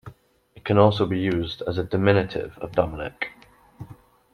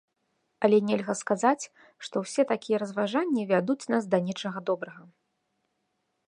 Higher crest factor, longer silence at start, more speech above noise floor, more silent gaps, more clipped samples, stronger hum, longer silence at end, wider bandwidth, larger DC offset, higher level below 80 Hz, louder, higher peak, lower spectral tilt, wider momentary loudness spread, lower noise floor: about the same, 20 dB vs 20 dB; second, 0.05 s vs 0.6 s; second, 31 dB vs 50 dB; neither; neither; neither; second, 0.4 s vs 1.25 s; second, 6.4 kHz vs 11 kHz; neither; first, -50 dBFS vs -80 dBFS; first, -23 LUFS vs -27 LUFS; first, -4 dBFS vs -8 dBFS; first, -8 dB/octave vs -5.5 dB/octave; first, 23 LU vs 9 LU; second, -53 dBFS vs -78 dBFS